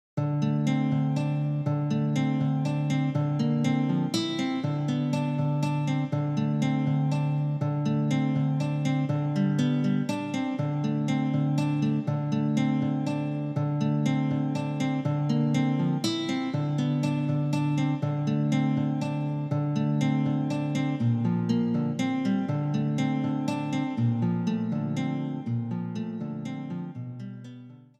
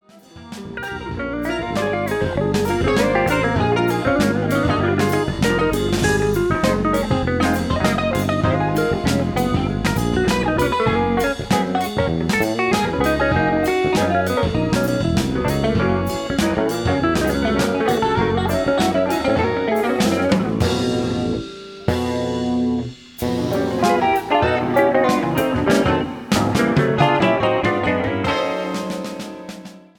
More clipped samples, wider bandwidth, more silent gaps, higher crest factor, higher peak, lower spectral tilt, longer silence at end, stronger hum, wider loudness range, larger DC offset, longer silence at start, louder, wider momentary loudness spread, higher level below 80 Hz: neither; second, 8.8 kHz vs over 20 kHz; neither; about the same, 14 dB vs 18 dB; second, -12 dBFS vs 0 dBFS; first, -7.5 dB/octave vs -6 dB/octave; about the same, 0.25 s vs 0.2 s; neither; about the same, 2 LU vs 3 LU; neither; about the same, 0.15 s vs 0.15 s; second, -27 LUFS vs -19 LUFS; about the same, 5 LU vs 6 LU; second, -76 dBFS vs -36 dBFS